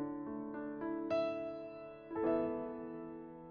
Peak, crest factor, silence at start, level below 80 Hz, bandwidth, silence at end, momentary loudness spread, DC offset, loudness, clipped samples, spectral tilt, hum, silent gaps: -22 dBFS; 18 dB; 0 s; -70 dBFS; 6.4 kHz; 0 s; 13 LU; under 0.1%; -40 LUFS; under 0.1%; -5.5 dB/octave; none; none